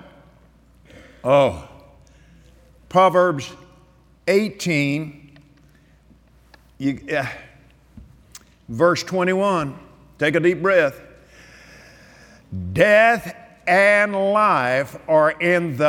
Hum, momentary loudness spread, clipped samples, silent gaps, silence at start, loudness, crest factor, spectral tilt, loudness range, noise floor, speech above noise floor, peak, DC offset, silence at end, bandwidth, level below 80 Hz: none; 16 LU; under 0.1%; none; 1.25 s; -19 LUFS; 20 dB; -5.5 dB/octave; 9 LU; -53 dBFS; 35 dB; -2 dBFS; under 0.1%; 0 s; 17 kHz; -54 dBFS